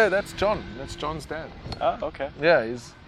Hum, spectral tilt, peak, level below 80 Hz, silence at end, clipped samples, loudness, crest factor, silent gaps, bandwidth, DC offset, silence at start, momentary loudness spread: none; -5 dB/octave; -6 dBFS; -46 dBFS; 0 s; under 0.1%; -26 LUFS; 20 dB; none; 14 kHz; under 0.1%; 0 s; 14 LU